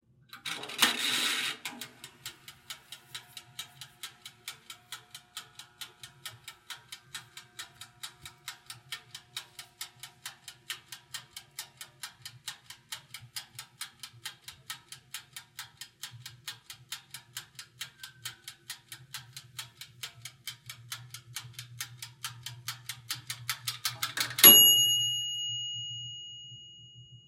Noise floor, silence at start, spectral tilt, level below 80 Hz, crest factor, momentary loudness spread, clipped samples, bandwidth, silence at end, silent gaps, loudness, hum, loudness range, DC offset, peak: -53 dBFS; 0.35 s; 0.5 dB/octave; -78 dBFS; 32 dB; 19 LU; under 0.1%; 16.5 kHz; 0.1 s; none; -24 LUFS; none; 23 LU; under 0.1%; -2 dBFS